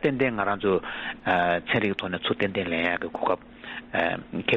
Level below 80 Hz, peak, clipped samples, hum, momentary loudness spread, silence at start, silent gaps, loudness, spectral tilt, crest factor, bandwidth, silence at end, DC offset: -56 dBFS; -10 dBFS; under 0.1%; none; 7 LU; 0 s; none; -26 LUFS; -3 dB/octave; 18 dB; 7.4 kHz; 0 s; under 0.1%